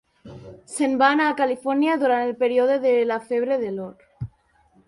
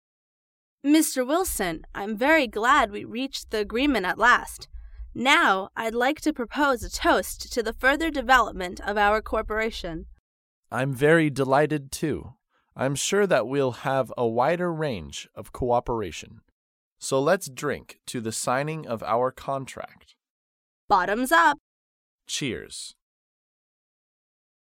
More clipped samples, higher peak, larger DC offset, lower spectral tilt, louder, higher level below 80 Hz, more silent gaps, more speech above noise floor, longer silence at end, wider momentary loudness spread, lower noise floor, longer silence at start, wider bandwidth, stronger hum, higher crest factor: neither; about the same, -4 dBFS vs -2 dBFS; neither; about the same, -5 dB/octave vs -4 dB/octave; first, -21 LUFS vs -24 LUFS; second, -58 dBFS vs -46 dBFS; second, none vs 10.19-10.63 s, 16.52-16.96 s, 20.30-20.88 s, 21.60-22.19 s; second, 39 dB vs over 66 dB; second, 0.6 s vs 1.75 s; first, 19 LU vs 15 LU; second, -60 dBFS vs under -90 dBFS; second, 0.25 s vs 0.85 s; second, 11.5 kHz vs 17 kHz; neither; about the same, 18 dB vs 22 dB